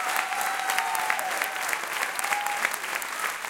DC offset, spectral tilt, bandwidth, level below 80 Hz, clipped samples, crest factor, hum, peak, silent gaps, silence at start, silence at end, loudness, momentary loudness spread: under 0.1%; 1 dB/octave; 17 kHz; -74 dBFS; under 0.1%; 22 dB; none; -6 dBFS; none; 0 s; 0 s; -27 LUFS; 3 LU